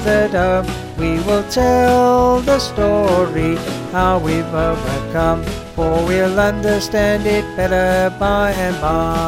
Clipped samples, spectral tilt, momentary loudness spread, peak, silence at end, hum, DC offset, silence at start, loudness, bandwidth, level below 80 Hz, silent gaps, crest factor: under 0.1%; -5.5 dB/octave; 7 LU; -2 dBFS; 0 s; none; under 0.1%; 0 s; -16 LUFS; 16.5 kHz; -30 dBFS; none; 14 dB